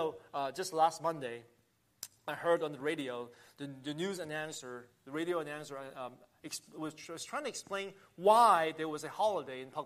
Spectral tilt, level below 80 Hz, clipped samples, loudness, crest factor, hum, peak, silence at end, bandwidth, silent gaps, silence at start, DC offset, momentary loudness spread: -4 dB/octave; -82 dBFS; under 0.1%; -35 LUFS; 22 dB; none; -14 dBFS; 0 s; 15 kHz; none; 0 s; under 0.1%; 18 LU